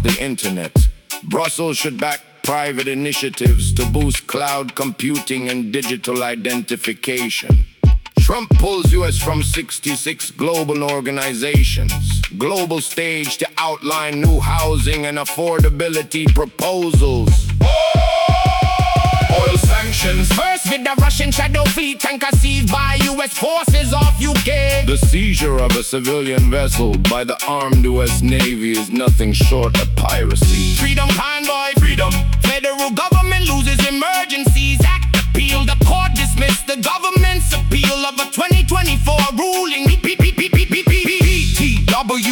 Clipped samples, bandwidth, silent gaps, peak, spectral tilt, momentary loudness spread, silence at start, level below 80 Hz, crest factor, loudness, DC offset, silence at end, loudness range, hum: under 0.1%; 19 kHz; none; -2 dBFS; -4.5 dB/octave; 6 LU; 0 s; -18 dBFS; 12 dB; -16 LUFS; under 0.1%; 0 s; 4 LU; none